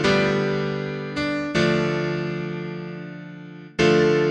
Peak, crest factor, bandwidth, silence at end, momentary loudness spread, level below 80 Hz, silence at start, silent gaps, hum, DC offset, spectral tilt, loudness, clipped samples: -6 dBFS; 16 dB; 10 kHz; 0 s; 17 LU; -50 dBFS; 0 s; none; none; under 0.1%; -6 dB/octave; -23 LUFS; under 0.1%